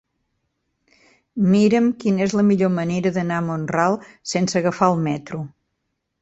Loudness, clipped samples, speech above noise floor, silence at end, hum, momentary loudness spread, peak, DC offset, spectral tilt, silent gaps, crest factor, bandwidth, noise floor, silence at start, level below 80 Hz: -20 LUFS; under 0.1%; 56 dB; 0.75 s; none; 11 LU; -2 dBFS; under 0.1%; -6.5 dB/octave; none; 18 dB; 8 kHz; -75 dBFS; 1.35 s; -58 dBFS